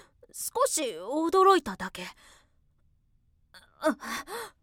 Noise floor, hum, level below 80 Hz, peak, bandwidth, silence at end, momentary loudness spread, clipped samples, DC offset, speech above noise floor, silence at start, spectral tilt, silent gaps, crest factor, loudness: -67 dBFS; none; -64 dBFS; -10 dBFS; 17.5 kHz; 0.15 s; 18 LU; under 0.1%; under 0.1%; 39 dB; 0.35 s; -2.5 dB/octave; none; 20 dB; -27 LUFS